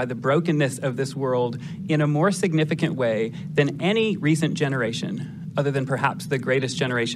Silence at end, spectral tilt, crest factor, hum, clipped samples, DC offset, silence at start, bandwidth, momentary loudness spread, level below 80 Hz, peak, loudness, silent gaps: 0 s; -6 dB/octave; 18 dB; none; under 0.1%; under 0.1%; 0 s; 13.5 kHz; 6 LU; -64 dBFS; -6 dBFS; -23 LUFS; none